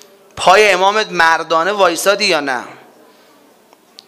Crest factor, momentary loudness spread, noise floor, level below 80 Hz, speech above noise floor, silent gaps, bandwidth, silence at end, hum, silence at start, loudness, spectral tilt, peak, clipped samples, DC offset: 16 dB; 8 LU; -48 dBFS; -54 dBFS; 36 dB; none; 16 kHz; 1.3 s; none; 0.35 s; -12 LUFS; -2 dB/octave; 0 dBFS; 0.2%; under 0.1%